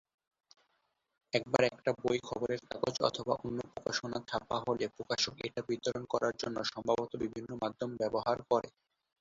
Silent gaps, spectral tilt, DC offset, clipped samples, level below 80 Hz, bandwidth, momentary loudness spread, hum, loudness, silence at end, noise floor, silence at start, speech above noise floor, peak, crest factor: none; -3 dB/octave; under 0.1%; under 0.1%; -66 dBFS; 7.6 kHz; 7 LU; none; -35 LUFS; 0.5 s; -80 dBFS; 1.35 s; 45 dB; -10 dBFS; 26 dB